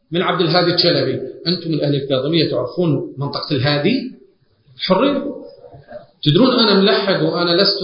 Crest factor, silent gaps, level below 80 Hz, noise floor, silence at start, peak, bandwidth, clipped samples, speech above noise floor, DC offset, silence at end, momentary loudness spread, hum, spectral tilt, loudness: 18 dB; none; -54 dBFS; -53 dBFS; 0.1 s; 0 dBFS; 5.4 kHz; under 0.1%; 37 dB; under 0.1%; 0 s; 11 LU; none; -9 dB/octave; -16 LUFS